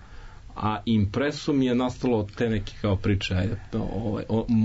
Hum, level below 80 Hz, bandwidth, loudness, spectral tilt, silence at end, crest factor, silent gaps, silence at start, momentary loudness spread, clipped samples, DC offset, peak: none; -42 dBFS; 8 kHz; -26 LUFS; -7 dB/octave; 0 s; 12 dB; none; 0 s; 7 LU; under 0.1%; under 0.1%; -14 dBFS